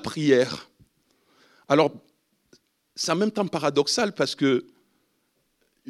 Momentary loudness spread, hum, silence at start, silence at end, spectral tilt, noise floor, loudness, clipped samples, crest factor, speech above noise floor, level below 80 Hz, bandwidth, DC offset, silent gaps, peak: 7 LU; none; 0 s; 1.3 s; -4.5 dB/octave; -71 dBFS; -24 LUFS; under 0.1%; 22 dB; 48 dB; -70 dBFS; 13.5 kHz; under 0.1%; none; -4 dBFS